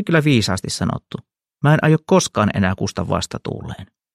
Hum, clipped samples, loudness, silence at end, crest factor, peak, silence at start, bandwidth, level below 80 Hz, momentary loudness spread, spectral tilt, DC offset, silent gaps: none; under 0.1%; -18 LUFS; 0.3 s; 16 dB; -2 dBFS; 0 s; 13.5 kHz; -46 dBFS; 17 LU; -5.5 dB/octave; under 0.1%; none